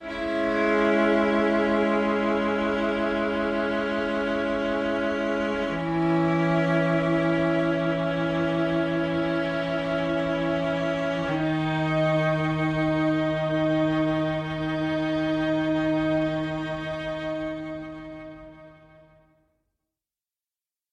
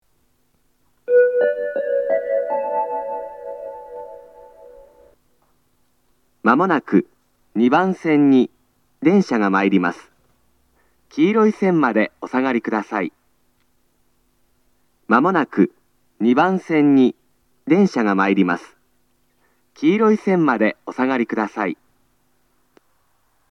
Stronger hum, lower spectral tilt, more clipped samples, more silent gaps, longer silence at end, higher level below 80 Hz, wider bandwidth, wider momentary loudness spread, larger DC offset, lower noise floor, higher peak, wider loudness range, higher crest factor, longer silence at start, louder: neither; about the same, -7.5 dB/octave vs -7.5 dB/octave; neither; neither; first, 2.2 s vs 1.75 s; first, -50 dBFS vs -68 dBFS; first, 8.8 kHz vs 7.8 kHz; second, 7 LU vs 15 LU; neither; first, under -90 dBFS vs -65 dBFS; second, -10 dBFS vs 0 dBFS; about the same, 7 LU vs 7 LU; second, 14 dB vs 20 dB; second, 0 s vs 1.1 s; second, -25 LUFS vs -18 LUFS